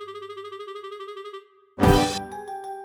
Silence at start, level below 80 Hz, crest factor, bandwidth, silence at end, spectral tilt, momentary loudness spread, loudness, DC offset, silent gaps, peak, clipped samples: 0 s; -38 dBFS; 24 dB; over 20 kHz; 0 s; -5.5 dB/octave; 21 LU; -23 LUFS; under 0.1%; none; -4 dBFS; under 0.1%